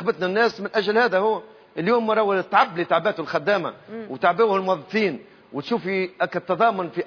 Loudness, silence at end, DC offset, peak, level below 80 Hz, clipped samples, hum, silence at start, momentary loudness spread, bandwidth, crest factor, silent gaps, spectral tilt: -22 LUFS; 0 s; under 0.1%; -4 dBFS; -70 dBFS; under 0.1%; none; 0 s; 11 LU; 5.4 kHz; 18 dB; none; -6.5 dB/octave